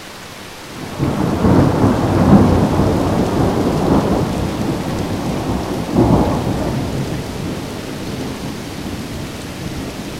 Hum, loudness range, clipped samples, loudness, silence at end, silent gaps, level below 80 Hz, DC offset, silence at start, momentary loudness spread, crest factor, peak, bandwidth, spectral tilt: none; 9 LU; under 0.1%; -17 LUFS; 0 s; none; -30 dBFS; 0.3%; 0 s; 13 LU; 16 dB; 0 dBFS; 16 kHz; -7 dB/octave